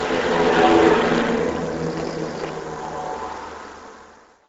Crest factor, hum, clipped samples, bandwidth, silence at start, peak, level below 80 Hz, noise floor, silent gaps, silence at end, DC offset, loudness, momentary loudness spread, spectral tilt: 20 dB; none; under 0.1%; 8 kHz; 0 s; -2 dBFS; -46 dBFS; -48 dBFS; none; 0.4 s; under 0.1%; -20 LUFS; 19 LU; -5 dB/octave